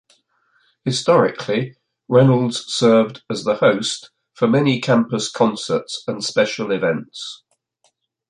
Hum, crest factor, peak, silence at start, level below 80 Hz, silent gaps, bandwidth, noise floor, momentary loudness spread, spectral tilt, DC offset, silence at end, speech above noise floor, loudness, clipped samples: none; 18 dB; -2 dBFS; 0.85 s; -62 dBFS; none; 11 kHz; -65 dBFS; 11 LU; -5.5 dB/octave; under 0.1%; 0.95 s; 47 dB; -18 LUFS; under 0.1%